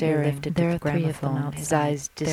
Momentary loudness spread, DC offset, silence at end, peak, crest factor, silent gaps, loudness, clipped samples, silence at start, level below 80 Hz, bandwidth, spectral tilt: 4 LU; under 0.1%; 0 s; -8 dBFS; 16 dB; none; -25 LUFS; under 0.1%; 0 s; -52 dBFS; 15 kHz; -6 dB/octave